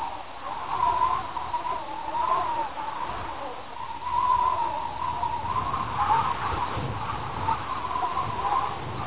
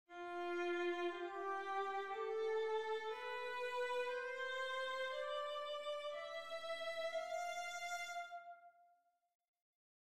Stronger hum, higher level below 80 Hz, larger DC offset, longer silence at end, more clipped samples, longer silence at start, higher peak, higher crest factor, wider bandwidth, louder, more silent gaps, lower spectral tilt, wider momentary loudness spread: neither; first, -46 dBFS vs -86 dBFS; first, 1% vs under 0.1%; second, 0 s vs 0.25 s; neither; about the same, 0 s vs 0.05 s; first, -12 dBFS vs -30 dBFS; about the same, 16 dB vs 14 dB; second, 4 kHz vs 15 kHz; first, -28 LUFS vs -43 LUFS; second, none vs 9.35-9.39 s, 9.48-9.54 s, 9.62-9.73 s; first, -3.5 dB/octave vs -1.5 dB/octave; first, 11 LU vs 6 LU